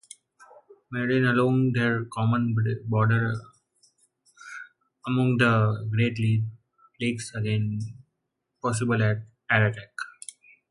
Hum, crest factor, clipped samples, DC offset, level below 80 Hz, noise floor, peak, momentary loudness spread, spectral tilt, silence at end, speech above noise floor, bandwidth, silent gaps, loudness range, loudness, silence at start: none; 20 dB; under 0.1%; under 0.1%; -60 dBFS; -80 dBFS; -6 dBFS; 16 LU; -6.5 dB/octave; 0.65 s; 56 dB; 11.5 kHz; none; 4 LU; -25 LUFS; 0.9 s